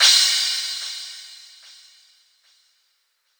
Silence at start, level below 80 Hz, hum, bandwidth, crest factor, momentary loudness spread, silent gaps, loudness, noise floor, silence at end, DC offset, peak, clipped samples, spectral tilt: 0 s; under -90 dBFS; none; over 20 kHz; 22 dB; 27 LU; none; -18 LUFS; -69 dBFS; 2.05 s; under 0.1%; -2 dBFS; under 0.1%; 11 dB/octave